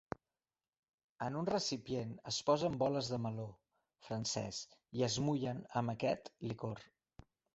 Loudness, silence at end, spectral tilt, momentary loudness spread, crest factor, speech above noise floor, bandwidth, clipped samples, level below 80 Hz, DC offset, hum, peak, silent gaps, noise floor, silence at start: -39 LUFS; 0.7 s; -5 dB/octave; 12 LU; 20 dB; over 52 dB; 8 kHz; under 0.1%; -70 dBFS; under 0.1%; none; -20 dBFS; none; under -90 dBFS; 1.2 s